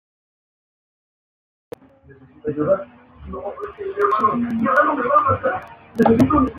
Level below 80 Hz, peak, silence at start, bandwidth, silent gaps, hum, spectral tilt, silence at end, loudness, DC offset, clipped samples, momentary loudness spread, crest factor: -46 dBFS; -2 dBFS; 2.45 s; 14.5 kHz; none; none; -8 dB/octave; 0 s; -19 LUFS; under 0.1%; under 0.1%; 16 LU; 18 dB